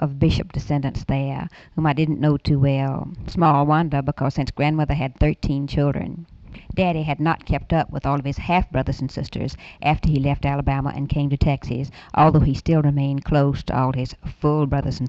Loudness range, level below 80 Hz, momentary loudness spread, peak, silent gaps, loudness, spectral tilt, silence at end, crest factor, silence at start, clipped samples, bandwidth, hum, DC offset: 3 LU; -34 dBFS; 10 LU; -6 dBFS; none; -21 LUFS; -8.5 dB/octave; 0 s; 16 dB; 0 s; under 0.1%; 7.4 kHz; none; under 0.1%